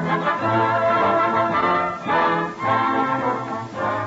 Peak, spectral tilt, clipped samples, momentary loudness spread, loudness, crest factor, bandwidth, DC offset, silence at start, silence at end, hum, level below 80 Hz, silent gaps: -8 dBFS; -6.5 dB/octave; under 0.1%; 6 LU; -20 LUFS; 12 dB; 8 kHz; under 0.1%; 0 s; 0 s; none; -58 dBFS; none